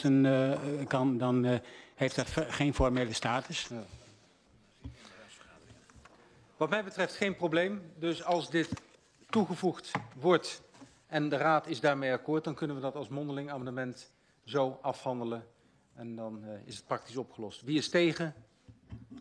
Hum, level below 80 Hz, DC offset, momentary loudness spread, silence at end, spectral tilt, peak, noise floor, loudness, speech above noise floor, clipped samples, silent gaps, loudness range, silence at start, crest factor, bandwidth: none; -54 dBFS; under 0.1%; 17 LU; 0 s; -5.5 dB/octave; -12 dBFS; -64 dBFS; -33 LUFS; 32 dB; under 0.1%; none; 7 LU; 0 s; 20 dB; 11 kHz